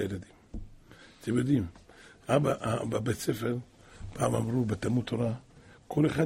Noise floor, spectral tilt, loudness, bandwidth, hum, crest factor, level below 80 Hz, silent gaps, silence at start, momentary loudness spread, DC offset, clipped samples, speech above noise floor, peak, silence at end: -54 dBFS; -6.5 dB/octave; -31 LUFS; 16 kHz; none; 20 dB; -52 dBFS; none; 0 s; 19 LU; under 0.1%; under 0.1%; 25 dB; -12 dBFS; 0 s